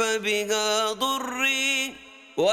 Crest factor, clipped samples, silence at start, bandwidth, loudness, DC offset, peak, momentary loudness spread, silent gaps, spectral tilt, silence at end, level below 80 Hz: 14 dB; under 0.1%; 0 s; 18.5 kHz; -24 LUFS; under 0.1%; -10 dBFS; 9 LU; none; -1 dB/octave; 0 s; -66 dBFS